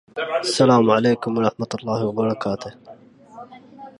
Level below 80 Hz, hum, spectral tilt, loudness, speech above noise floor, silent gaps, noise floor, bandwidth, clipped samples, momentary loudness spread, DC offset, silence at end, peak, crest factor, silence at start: -60 dBFS; none; -5.5 dB/octave; -20 LUFS; 23 dB; none; -42 dBFS; 11.5 kHz; under 0.1%; 16 LU; under 0.1%; 0.1 s; -2 dBFS; 18 dB; 0.15 s